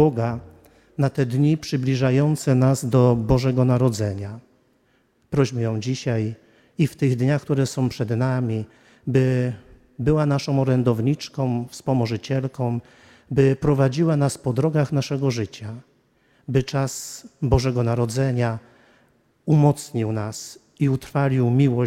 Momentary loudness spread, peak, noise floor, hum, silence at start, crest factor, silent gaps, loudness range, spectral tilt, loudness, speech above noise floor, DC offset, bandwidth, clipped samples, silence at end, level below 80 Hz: 13 LU; -4 dBFS; -63 dBFS; none; 0 s; 18 dB; none; 4 LU; -7 dB/octave; -22 LUFS; 42 dB; under 0.1%; 14.5 kHz; under 0.1%; 0 s; -44 dBFS